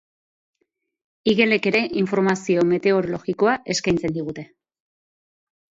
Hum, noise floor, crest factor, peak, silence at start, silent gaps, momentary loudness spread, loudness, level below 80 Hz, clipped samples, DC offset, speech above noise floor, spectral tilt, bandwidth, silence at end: none; -74 dBFS; 18 dB; -4 dBFS; 1.25 s; none; 9 LU; -21 LUFS; -56 dBFS; under 0.1%; under 0.1%; 53 dB; -5 dB/octave; 7.8 kHz; 1.35 s